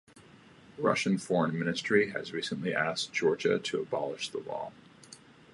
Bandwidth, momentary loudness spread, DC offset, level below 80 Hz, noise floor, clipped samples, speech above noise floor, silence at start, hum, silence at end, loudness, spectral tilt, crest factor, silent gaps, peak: 11.5 kHz; 12 LU; under 0.1%; -72 dBFS; -56 dBFS; under 0.1%; 25 dB; 0.15 s; none; 0.35 s; -31 LUFS; -4.5 dB/octave; 20 dB; none; -12 dBFS